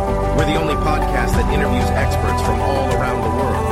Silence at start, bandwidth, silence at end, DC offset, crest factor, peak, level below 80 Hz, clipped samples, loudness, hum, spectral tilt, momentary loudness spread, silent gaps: 0 s; 15.5 kHz; 0 s; under 0.1%; 14 dB; -4 dBFS; -24 dBFS; under 0.1%; -18 LUFS; none; -6 dB/octave; 1 LU; none